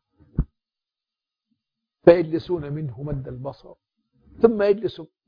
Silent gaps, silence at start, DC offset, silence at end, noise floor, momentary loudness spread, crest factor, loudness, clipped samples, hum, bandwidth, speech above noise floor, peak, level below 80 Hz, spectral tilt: none; 0.35 s; under 0.1%; 0.2 s; -89 dBFS; 18 LU; 24 dB; -22 LUFS; under 0.1%; none; 5.2 kHz; 67 dB; 0 dBFS; -42 dBFS; -10 dB/octave